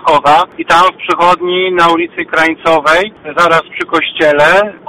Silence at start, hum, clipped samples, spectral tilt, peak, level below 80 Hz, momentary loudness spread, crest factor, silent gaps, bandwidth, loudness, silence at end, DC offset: 0 s; none; under 0.1%; -4 dB/octave; 0 dBFS; -44 dBFS; 6 LU; 10 dB; none; 16 kHz; -10 LUFS; 0.1 s; 0.4%